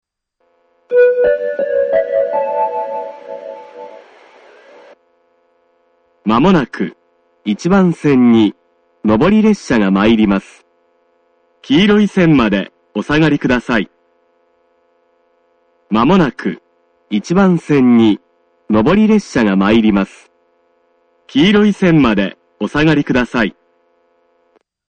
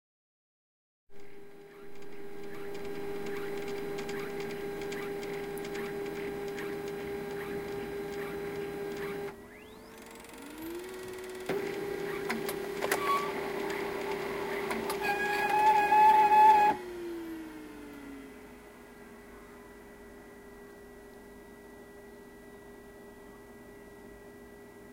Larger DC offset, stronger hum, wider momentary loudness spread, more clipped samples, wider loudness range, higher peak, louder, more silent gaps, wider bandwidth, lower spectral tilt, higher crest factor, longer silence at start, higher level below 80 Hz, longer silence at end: neither; neither; second, 13 LU vs 25 LU; neither; second, 7 LU vs 25 LU; first, 0 dBFS vs -12 dBFS; first, -13 LUFS vs -31 LUFS; neither; second, 9 kHz vs 17 kHz; first, -7 dB/octave vs -4 dB/octave; second, 14 dB vs 22 dB; second, 0.9 s vs 1.1 s; first, -40 dBFS vs -62 dBFS; first, 1.4 s vs 0 s